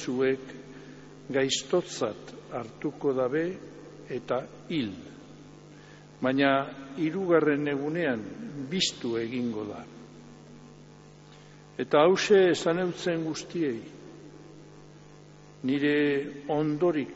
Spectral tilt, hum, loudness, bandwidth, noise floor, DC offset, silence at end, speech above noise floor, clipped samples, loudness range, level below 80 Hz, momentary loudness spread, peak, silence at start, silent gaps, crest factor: -4 dB/octave; 50 Hz at -55 dBFS; -28 LUFS; 8 kHz; -51 dBFS; under 0.1%; 0 s; 23 dB; under 0.1%; 7 LU; -66 dBFS; 24 LU; -10 dBFS; 0 s; none; 20 dB